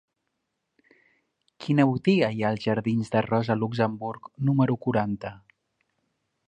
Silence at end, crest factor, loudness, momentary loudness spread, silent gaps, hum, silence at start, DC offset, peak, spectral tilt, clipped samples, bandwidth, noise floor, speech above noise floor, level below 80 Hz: 1.1 s; 20 dB; -25 LUFS; 12 LU; none; none; 1.6 s; under 0.1%; -6 dBFS; -8 dB/octave; under 0.1%; 10 kHz; -80 dBFS; 55 dB; -62 dBFS